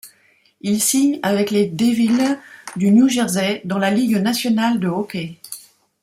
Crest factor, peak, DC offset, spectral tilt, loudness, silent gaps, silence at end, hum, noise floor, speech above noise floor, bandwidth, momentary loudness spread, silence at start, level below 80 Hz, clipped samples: 14 dB; -4 dBFS; under 0.1%; -4.5 dB/octave; -18 LUFS; none; 0.45 s; none; -57 dBFS; 40 dB; 16 kHz; 14 LU; 0.05 s; -62 dBFS; under 0.1%